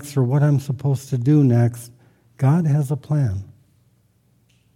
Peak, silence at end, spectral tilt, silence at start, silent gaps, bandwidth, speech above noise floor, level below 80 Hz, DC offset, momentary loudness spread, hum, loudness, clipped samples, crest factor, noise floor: -6 dBFS; 1.3 s; -8.5 dB/octave; 0 s; none; 14.5 kHz; 42 dB; -58 dBFS; under 0.1%; 7 LU; 60 Hz at -35 dBFS; -19 LUFS; under 0.1%; 14 dB; -60 dBFS